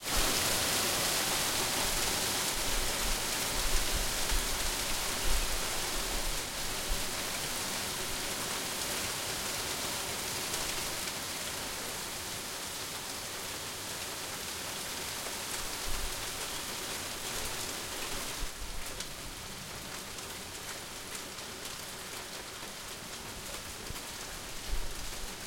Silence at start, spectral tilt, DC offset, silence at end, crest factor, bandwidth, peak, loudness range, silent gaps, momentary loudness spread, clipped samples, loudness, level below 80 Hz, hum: 0 s; -1 dB/octave; under 0.1%; 0 s; 20 dB; 16.5 kHz; -16 dBFS; 10 LU; none; 11 LU; under 0.1%; -34 LUFS; -44 dBFS; none